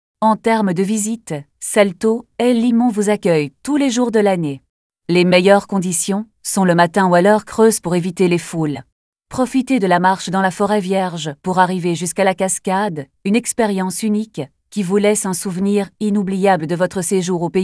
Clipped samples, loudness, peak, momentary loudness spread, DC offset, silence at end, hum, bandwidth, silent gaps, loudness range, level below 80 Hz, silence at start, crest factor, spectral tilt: under 0.1%; -16 LUFS; 0 dBFS; 9 LU; under 0.1%; 0 s; none; 11 kHz; 4.69-4.90 s, 8.92-9.13 s; 3 LU; -56 dBFS; 0.2 s; 16 dB; -5 dB/octave